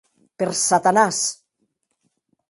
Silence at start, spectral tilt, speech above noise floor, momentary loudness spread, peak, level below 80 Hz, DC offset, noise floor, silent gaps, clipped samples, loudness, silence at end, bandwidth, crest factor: 0.4 s; -2.5 dB/octave; 53 dB; 10 LU; -2 dBFS; -68 dBFS; under 0.1%; -72 dBFS; none; under 0.1%; -19 LUFS; 1.2 s; 11.5 kHz; 22 dB